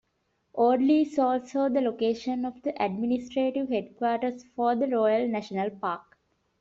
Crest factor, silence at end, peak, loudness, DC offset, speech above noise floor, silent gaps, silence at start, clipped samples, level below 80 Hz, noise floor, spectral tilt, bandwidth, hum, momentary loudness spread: 14 dB; 0.6 s; -12 dBFS; -27 LUFS; under 0.1%; 48 dB; none; 0.55 s; under 0.1%; -68 dBFS; -74 dBFS; -5 dB/octave; 7.6 kHz; none; 9 LU